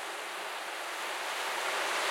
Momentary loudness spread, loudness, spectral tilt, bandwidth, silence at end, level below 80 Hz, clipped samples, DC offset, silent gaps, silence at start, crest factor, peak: 6 LU; -34 LUFS; 1 dB/octave; 16.5 kHz; 0 s; under -90 dBFS; under 0.1%; under 0.1%; none; 0 s; 16 dB; -20 dBFS